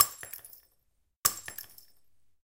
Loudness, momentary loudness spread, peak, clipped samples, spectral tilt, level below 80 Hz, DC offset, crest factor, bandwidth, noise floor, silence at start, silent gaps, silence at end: -31 LUFS; 21 LU; -2 dBFS; under 0.1%; 1 dB/octave; -70 dBFS; under 0.1%; 32 dB; 17 kHz; -74 dBFS; 0 s; 1.16-1.23 s; 0.8 s